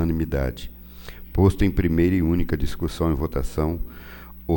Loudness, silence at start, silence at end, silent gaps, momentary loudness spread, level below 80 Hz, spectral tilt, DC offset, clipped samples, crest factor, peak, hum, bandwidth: -23 LUFS; 0 s; 0 s; none; 20 LU; -30 dBFS; -8 dB/octave; under 0.1%; under 0.1%; 18 dB; -4 dBFS; none; 18 kHz